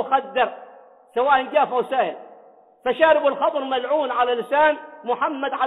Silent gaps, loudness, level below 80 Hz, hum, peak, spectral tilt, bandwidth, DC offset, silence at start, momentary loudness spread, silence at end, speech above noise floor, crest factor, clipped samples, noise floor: none; -21 LUFS; -66 dBFS; none; -4 dBFS; -5.5 dB/octave; 4.1 kHz; under 0.1%; 0 s; 11 LU; 0 s; 30 dB; 18 dB; under 0.1%; -50 dBFS